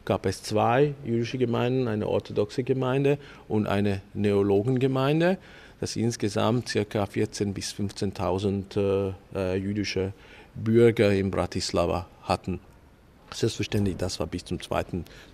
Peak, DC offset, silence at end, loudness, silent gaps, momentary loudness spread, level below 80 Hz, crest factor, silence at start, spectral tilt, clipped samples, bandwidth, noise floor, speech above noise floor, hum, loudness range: -8 dBFS; under 0.1%; 0.1 s; -27 LUFS; none; 9 LU; -52 dBFS; 18 dB; 0.05 s; -6 dB/octave; under 0.1%; 14.5 kHz; -54 dBFS; 28 dB; none; 4 LU